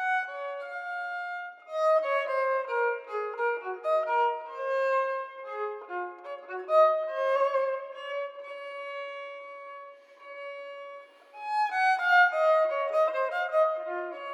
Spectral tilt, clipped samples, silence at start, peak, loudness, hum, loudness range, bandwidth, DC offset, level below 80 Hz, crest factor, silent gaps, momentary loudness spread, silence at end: 0 dB/octave; under 0.1%; 0 s; -10 dBFS; -28 LUFS; none; 11 LU; 9.4 kHz; under 0.1%; under -90 dBFS; 18 dB; none; 18 LU; 0 s